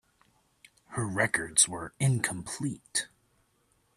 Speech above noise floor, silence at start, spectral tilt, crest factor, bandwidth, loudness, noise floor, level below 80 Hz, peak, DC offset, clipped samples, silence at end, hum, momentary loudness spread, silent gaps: 41 dB; 0.9 s; -3 dB/octave; 24 dB; 13.5 kHz; -28 LUFS; -71 dBFS; -64 dBFS; -8 dBFS; under 0.1%; under 0.1%; 0.9 s; none; 12 LU; none